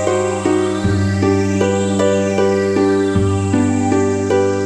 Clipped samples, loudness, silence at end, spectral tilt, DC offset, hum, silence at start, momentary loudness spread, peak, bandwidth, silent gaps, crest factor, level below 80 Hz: under 0.1%; -16 LUFS; 0 s; -6.5 dB/octave; under 0.1%; none; 0 s; 2 LU; -2 dBFS; 11 kHz; none; 12 dB; -42 dBFS